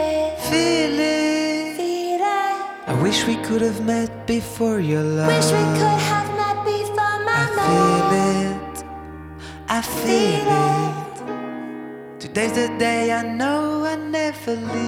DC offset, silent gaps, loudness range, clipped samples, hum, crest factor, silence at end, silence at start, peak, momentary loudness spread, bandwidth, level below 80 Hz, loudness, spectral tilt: under 0.1%; none; 4 LU; under 0.1%; none; 16 dB; 0 s; 0 s; -4 dBFS; 13 LU; 17.5 kHz; -48 dBFS; -20 LUFS; -5 dB/octave